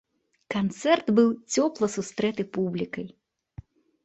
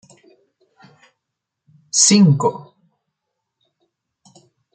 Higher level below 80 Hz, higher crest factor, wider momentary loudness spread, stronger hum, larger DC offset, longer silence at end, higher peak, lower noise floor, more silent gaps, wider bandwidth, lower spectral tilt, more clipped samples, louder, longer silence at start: about the same, -62 dBFS vs -66 dBFS; about the same, 20 dB vs 22 dB; about the same, 11 LU vs 13 LU; neither; neither; second, 0.95 s vs 2.15 s; second, -8 dBFS vs 0 dBFS; second, -48 dBFS vs -80 dBFS; neither; second, 8.4 kHz vs 9.6 kHz; about the same, -5 dB/octave vs -4 dB/octave; neither; second, -26 LUFS vs -14 LUFS; second, 0.5 s vs 1.95 s